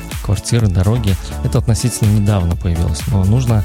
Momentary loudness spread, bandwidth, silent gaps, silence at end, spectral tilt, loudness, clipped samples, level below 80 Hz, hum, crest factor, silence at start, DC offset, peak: 5 LU; 16 kHz; none; 0 s; -6 dB/octave; -16 LUFS; under 0.1%; -24 dBFS; none; 12 dB; 0 s; under 0.1%; -2 dBFS